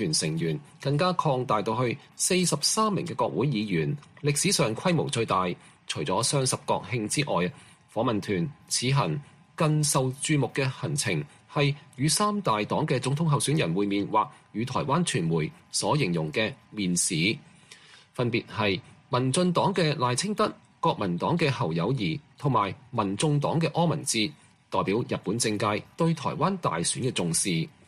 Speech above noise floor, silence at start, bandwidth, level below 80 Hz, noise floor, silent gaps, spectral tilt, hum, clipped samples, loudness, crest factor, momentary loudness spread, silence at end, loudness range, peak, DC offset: 26 dB; 0 s; 14.5 kHz; -60 dBFS; -52 dBFS; none; -4.5 dB/octave; none; under 0.1%; -27 LUFS; 18 dB; 7 LU; 0.2 s; 2 LU; -10 dBFS; under 0.1%